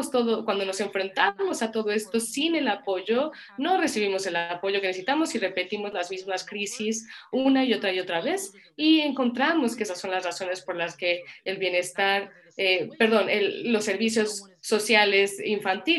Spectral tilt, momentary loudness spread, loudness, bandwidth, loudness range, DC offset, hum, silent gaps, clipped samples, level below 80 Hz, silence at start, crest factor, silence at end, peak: -3 dB/octave; 9 LU; -25 LUFS; 13 kHz; 4 LU; under 0.1%; none; none; under 0.1%; -74 dBFS; 0 s; 20 dB; 0 s; -6 dBFS